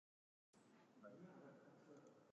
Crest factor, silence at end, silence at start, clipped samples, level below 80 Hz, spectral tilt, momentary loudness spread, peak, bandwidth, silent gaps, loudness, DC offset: 16 dB; 0 s; 0.55 s; under 0.1%; under -90 dBFS; -6.5 dB/octave; 4 LU; -52 dBFS; 8.4 kHz; none; -65 LUFS; under 0.1%